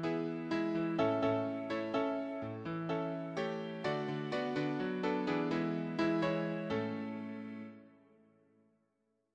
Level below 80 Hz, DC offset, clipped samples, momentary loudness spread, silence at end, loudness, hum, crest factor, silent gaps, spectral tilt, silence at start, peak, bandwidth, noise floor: -72 dBFS; under 0.1%; under 0.1%; 8 LU; 1.45 s; -36 LUFS; none; 18 dB; none; -7.5 dB/octave; 0 s; -18 dBFS; 8.4 kHz; -80 dBFS